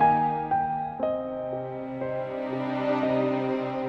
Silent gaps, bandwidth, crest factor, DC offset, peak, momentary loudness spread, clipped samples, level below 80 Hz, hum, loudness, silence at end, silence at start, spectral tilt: none; 6.2 kHz; 16 dB; under 0.1%; -10 dBFS; 8 LU; under 0.1%; -58 dBFS; none; -28 LUFS; 0 s; 0 s; -8.5 dB/octave